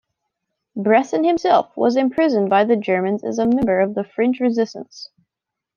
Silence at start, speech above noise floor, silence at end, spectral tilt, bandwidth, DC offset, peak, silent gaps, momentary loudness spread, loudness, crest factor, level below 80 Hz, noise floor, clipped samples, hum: 0.75 s; 66 dB; 0.75 s; -6.5 dB/octave; 7.2 kHz; under 0.1%; -2 dBFS; none; 13 LU; -18 LUFS; 18 dB; -56 dBFS; -84 dBFS; under 0.1%; none